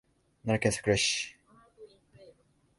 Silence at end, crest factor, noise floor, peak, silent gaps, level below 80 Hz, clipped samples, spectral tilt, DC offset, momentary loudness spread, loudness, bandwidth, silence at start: 0.55 s; 22 dB; -63 dBFS; -12 dBFS; none; -56 dBFS; under 0.1%; -3.5 dB/octave; under 0.1%; 13 LU; -29 LUFS; 11.5 kHz; 0.45 s